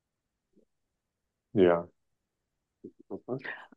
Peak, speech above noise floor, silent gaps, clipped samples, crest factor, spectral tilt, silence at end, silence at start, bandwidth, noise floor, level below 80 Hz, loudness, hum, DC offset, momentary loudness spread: -10 dBFS; 57 dB; none; under 0.1%; 22 dB; -9.5 dB/octave; 0.1 s; 1.55 s; 5 kHz; -85 dBFS; -66 dBFS; -29 LUFS; none; under 0.1%; 20 LU